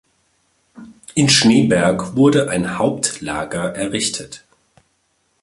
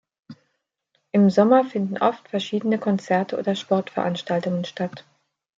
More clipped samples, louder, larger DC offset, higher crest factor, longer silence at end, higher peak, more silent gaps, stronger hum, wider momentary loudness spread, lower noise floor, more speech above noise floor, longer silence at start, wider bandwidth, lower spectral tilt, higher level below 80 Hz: neither; first, -16 LUFS vs -22 LUFS; neither; about the same, 18 dB vs 18 dB; first, 1.05 s vs 0.6 s; first, 0 dBFS vs -4 dBFS; neither; neither; first, 13 LU vs 10 LU; second, -65 dBFS vs -75 dBFS; second, 48 dB vs 54 dB; first, 0.75 s vs 0.3 s; first, 11.5 kHz vs 7.6 kHz; second, -4 dB/octave vs -7 dB/octave; first, -50 dBFS vs -70 dBFS